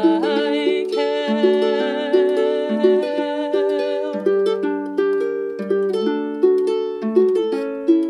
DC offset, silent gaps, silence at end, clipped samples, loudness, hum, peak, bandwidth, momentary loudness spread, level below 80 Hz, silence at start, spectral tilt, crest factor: under 0.1%; none; 0 s; under 0.1%; -19 LUFS; none; -4 dBFS; 10 kHz; 5 LU; -70 dBFS; 0 s; -6 dB/octave; 14 dB